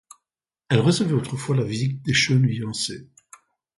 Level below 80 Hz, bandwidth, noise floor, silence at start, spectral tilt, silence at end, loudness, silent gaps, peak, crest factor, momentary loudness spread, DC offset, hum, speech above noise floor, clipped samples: -56 dBFS; 11.5 kHz; -87 dBFS; 0.7 s; -5 dB/octave; 0.75 s; -22 LUFS; none; -4 dBFS; 20 dB; 8 LU; under 0.1%; none; 65 dB; under 0.1%